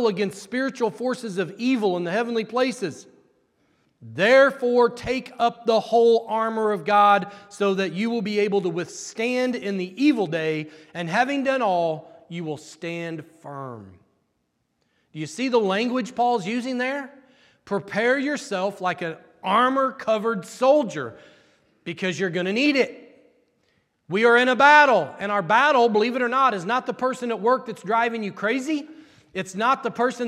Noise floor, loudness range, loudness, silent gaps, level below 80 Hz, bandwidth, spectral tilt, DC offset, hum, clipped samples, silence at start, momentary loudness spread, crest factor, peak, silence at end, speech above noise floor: -73 dBFS; 8 LU; -22 LUFS; none; -66 dBFS; 13 kHz; -5 dB/octave; under 0.1%; none; under 0.1%; 0 s; 15 LU; 20 dB; -2 dBFS; 0 s; 51 dB